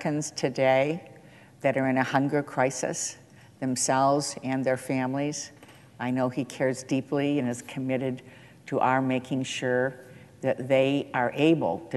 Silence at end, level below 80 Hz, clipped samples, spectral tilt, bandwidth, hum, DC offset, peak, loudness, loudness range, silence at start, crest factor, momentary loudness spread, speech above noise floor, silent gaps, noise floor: 0 s; -68 dBFS; under 0.1%; -5 dB/octave; 12.5 kHz; none; under 0.1%; -8 dBFS; -27 LUFS; 3 LU; 0 s; 18 dB; 10 LU; 25 dB; none; -52 dBFS